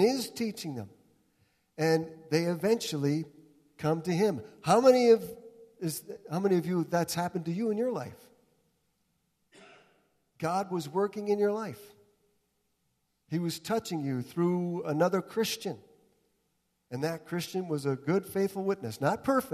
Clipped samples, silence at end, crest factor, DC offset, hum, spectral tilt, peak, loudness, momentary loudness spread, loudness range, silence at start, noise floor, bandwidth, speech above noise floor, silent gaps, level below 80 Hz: under 0.1%; 0 s; 20 dB; under 0.1%; none; -6 dB/octave; -10 dBFS; -30 LUFS; 12 LU; 8 LU; 0 s; -77 dBFS; 14 kHz; 48 dB; none; -72 dBFS